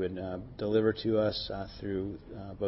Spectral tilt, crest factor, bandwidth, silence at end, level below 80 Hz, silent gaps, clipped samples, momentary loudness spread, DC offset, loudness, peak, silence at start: -10 dB/octave; 18 dB; 5.8 kHz; 0 s; -54 dBFS; none; under 0.1%; 12 LU; under 0.1%; -32 LUFS; -14 dBFS; 0 s